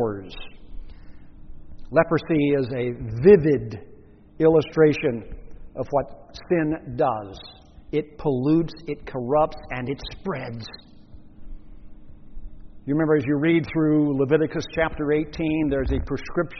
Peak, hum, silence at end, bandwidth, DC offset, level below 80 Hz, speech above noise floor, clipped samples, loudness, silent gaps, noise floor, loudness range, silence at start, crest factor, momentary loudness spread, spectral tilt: -2 dBFS; none; 0 s; 6.2 kHz; under 0.1%; -42 dBFS; 22 dB; under 0.1%; -23 LUFS; none; -44 dBFS; 8 LU; 0 s; 22 dB; 18 LU; -6.5 dB/octave